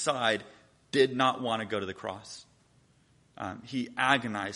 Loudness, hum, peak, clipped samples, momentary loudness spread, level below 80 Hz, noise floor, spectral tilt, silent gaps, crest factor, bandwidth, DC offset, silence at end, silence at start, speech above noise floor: -30 LUFS; none; -8 dBFS; under 0.1%; 15 LU; -70 dBFS; -65 dBFS; -4 dB/octave; none; 24 dB; 11.5 kHz; under 0.1%; 0 s; 0 s; 35 dB